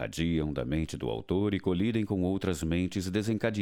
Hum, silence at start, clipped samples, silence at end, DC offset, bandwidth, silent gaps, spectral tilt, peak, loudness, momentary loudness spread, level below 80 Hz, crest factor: none; 0 s; under 0.1%; 0 s; under 0.1%; 17 kHz; none; -6.5 dB/octave; -14 dBFS; -31 LUFS; 3 LU; -46 dBFS; 16 dB